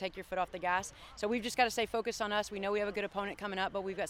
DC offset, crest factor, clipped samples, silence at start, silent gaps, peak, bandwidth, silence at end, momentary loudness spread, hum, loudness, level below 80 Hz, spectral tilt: under 0.1%; 20 dB; under 0.1%; 0 s; none; -16 dBFS; 17 kHz; 0 s; 7 LU; none; -35 LUFS; -62 dBFS; -3 dB/octave